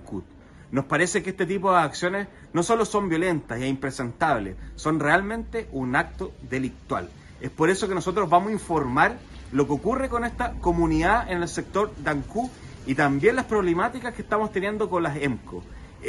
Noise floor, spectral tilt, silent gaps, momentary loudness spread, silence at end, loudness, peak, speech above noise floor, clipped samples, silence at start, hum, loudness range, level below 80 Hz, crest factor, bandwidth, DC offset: -47 dBFS; -5.5 dB/octave; none; 11 LU; 0 s; -25 LUFS; -4 dBFS; 23 dB; under 0.1%; 0 s; none; 2 LU; -42 dBFS; 20 dB; 12 kHz; under 0.1%